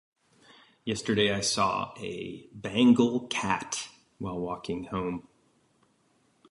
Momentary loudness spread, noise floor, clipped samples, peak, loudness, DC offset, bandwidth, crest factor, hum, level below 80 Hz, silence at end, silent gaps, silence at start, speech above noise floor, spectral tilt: 17 LU; -68 dBFS; under 0.1%; -10 dBFS; -28 LUFS; under 0.1%; 11.5 kHz; 20 dB; none; -60 dBFS; 1.3 s; none; 0.85 s; 40 dB; -4 dB/octave